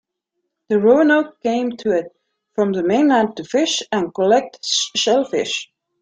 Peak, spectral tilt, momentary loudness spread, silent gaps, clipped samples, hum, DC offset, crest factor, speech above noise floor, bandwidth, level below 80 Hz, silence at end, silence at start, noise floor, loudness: -2 dBFS; -3.5 dB/octave; 8 LU; none; under 0.1%; none; under 0.1%; 16 dB; 59 dB; 9.4 kHz; -64 dBFS; 0.4 s; 0.7 s; -76 dBFS; -18 LUFS